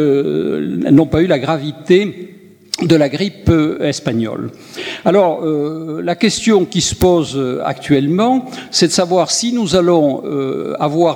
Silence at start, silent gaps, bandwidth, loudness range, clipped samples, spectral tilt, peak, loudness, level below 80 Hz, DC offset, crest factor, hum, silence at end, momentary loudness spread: 0 s; none; 20 kHz; 2 LU; under 0.1%; -5 dB/octave; 0 dBFS; -15 LUFS; -40 dBFS; under 0.1%; 14 dB; none; 0 s; 8 LU